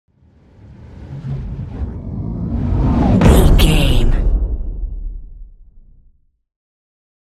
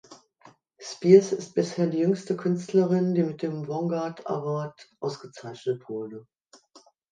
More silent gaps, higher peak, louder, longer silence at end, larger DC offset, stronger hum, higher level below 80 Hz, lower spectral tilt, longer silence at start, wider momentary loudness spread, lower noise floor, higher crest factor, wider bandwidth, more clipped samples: neither; first, 0 dBFS vs -4 dBFS; first, -16 LUFS vs -26 LUFS; first, 1.45 s vs 0.9 s; neither; neither; first, -18 dBFS vs -76 dBFS; about the same, -6.5 dB/octave vs -7 dB/octave; first, 0.7 s vs 0.1 s; about the same, 20 LU vs 21 LU; second, -53 dBFS vs -58 dBFS; second, 16 dB vs 22 dB; first, 14.5 kHz vs 9.4 kHz; neither